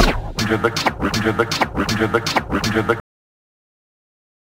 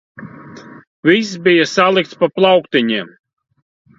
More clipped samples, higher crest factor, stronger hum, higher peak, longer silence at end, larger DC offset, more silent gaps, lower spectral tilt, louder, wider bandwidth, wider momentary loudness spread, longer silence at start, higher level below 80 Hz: neither; about the same, 20 dB vs 16 dB; neither; about the same, 0 dBFS vs 0 dBFS; first, 1.45 s vs 0.9 s; neither; second, none vs 0.87-1.03 s; about the same, -4.5 dB/octave vs -5 dB/octave; second, -19 LUFS vs -14 LUFS; first, 16.5 kHz vs 7.6 kHz; second, 3 LU vs 23 LU; second, 0 s vs 0.2 s; first, -32 dBFS vs -60 dBFS